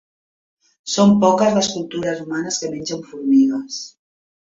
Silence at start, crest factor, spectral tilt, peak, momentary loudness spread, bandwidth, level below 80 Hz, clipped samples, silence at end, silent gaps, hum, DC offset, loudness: 0.85 s; 18 dB; -5 dB/octave; -2 dBFS; 15 LU; 7.8 kHz; -60 dBFS; under 0.1%; 0.6 s; none; none; under 0.1%; -18 LUFS